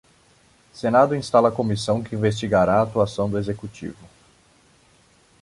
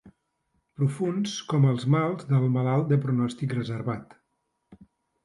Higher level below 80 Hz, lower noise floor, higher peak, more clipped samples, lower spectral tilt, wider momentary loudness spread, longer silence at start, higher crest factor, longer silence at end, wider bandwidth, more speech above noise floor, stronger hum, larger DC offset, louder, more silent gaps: first, -50 dBFS vs -64 dBFS; second, -57 dBFS vs -77 dBFS; first, -4 dBFS vs -10 dBFS; neither; about the same, -6.5 dB/octave vs -7.5 dB/octave; first, 13 LU vs 7 LU; first, 0.75 s vs 0.05 s; about the same, 20 dB vs 18 dB; first, 1.5 s vs 0.5 s; about the same, 11.5 kHz vs 11.5 kHz; second, 36 dB vs 52 dB; neither; neither; first, -21 LUFS vs -26 LUFS; neither